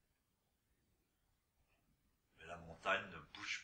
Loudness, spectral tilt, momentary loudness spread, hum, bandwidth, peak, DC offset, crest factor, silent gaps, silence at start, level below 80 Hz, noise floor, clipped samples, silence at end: -44 LUFS; -2.5 dB/octave; 15 LU; none; 15.5 kHz; -24 dBFS; under 0.1%; 26 dB; none; 2.35 s; -76 dBFS; -84 dBFS; under 0.1%; 0 s